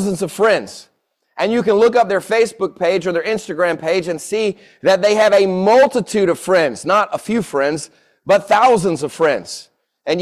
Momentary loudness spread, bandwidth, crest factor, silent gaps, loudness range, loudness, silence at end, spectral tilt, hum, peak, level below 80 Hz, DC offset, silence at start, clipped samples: 10 LU; 14 kHz; 14 dB; none; 3 LU; -16 LUFS; 0 s; -4.5 dB/octave; none; -2 dBFS; -58 dBFS; under 0.1%; 0 s; under 0.1%